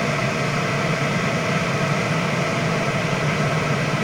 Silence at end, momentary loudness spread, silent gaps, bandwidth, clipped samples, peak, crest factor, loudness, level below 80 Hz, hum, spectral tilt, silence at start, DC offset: 0 s; 1 LU; none; 16 kHz; under 0.1%; -8 dBFS; 12 dB; -21 LUFS; -48 dBFS; none; -5 dB/octave; 0 s; under 0.1%